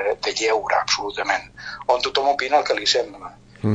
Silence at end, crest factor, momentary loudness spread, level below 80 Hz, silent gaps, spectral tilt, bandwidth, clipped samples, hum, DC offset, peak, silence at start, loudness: 0 s; 18 dB; 12 LU; -54 dBFS; none; -3 dB/octave; 9.4 kHz; under 0.1%; none; under 0.1%; -4 dBFS; 0 s; -21 LUFS